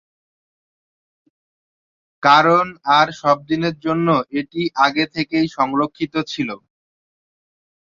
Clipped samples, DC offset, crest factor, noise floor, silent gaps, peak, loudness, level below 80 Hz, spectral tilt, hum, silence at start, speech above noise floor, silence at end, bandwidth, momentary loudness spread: under 0.1%; under 0.1%; 18 dB; under -90 dBFS; none; -2 dBFS; -18 LUFS; -60 dBFS; -5.5 dB/octave; none; 2.2 s; over 72 dB; 1.35 s; 7.6 kHz; 11 LU